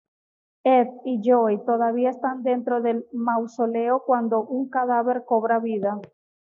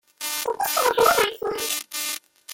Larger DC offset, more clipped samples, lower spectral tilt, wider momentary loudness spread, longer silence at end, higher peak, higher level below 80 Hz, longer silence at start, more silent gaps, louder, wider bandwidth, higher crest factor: neither; neither; first, -5.5 dB/octave vs -0.5 dB/octave; second, 7 LU vs 10 LU; first, 0.45 s vs 0 s; second, -8 dBFS vs -4 dBFS; second, -82 dBFS vs -58 dBFS; first, 0.65 s vs 0.2 s; neither; about the same, -23 LUFS vs -22 LUFS; second, 7.2 kHz vs 17 kHz; second, 14 dB vs 20 dB